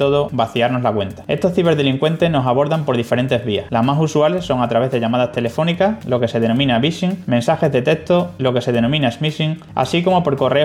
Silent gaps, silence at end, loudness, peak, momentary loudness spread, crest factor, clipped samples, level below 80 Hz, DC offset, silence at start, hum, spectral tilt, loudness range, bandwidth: none; 0 s; -17 LUFS; -2 dBFS; 4 LU; 14 dB; under 0.1%; -48 dBFS; under 0.1%; 0 s; none; -6.5 dB/octave; 1 LU; 14 kHz